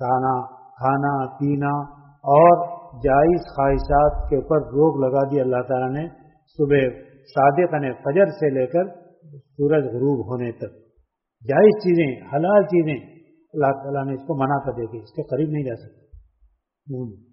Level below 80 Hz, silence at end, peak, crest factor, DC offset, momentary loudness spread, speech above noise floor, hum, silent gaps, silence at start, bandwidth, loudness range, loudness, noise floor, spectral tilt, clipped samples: -40 dBFS; 0.2 s; -2 dBFS; 18 dB; under 0.1%; 15 LU; 45 dB; none; none; 0 s; 5.8 kHz; 7 LU; -20 LUFS; -65 dBFS; -7.5 dB/octave; under 0.1%